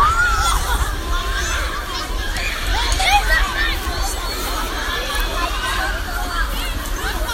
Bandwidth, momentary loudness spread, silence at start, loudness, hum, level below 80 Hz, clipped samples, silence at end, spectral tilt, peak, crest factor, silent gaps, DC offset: 16 kHz; 9 LU; 0 s; -20 LUFS; none; -22 dBFS; under 0.1%; 0 s; -2.5 dB/octave; 0 dBFS; 18 dB; none; under 0.1%